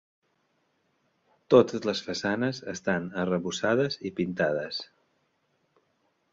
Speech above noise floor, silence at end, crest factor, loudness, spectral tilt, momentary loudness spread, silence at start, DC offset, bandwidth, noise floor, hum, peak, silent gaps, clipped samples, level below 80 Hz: 46 dB; 1.5 s; 24 dB; -27 LUFS; -5 dB/octave; 11 LU; 1.5 s; under 0.1%; 7.8 kHz; -73 dBFS; none; -6 dBFS; none; under 0.1%; -64 dBFS